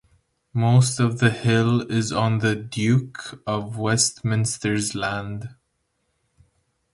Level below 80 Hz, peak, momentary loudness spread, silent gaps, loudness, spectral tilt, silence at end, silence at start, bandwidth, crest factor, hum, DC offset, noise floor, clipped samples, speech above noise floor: -54 dBFS; -2 dBFS; 12 LU; none; -22 LUFS; -5 dB/octave; 1.4 s; 0.55 s; 11.5 kHz; 20 dB; none; under 0.1%; -72 dBFS; under 0.1%; 51 dB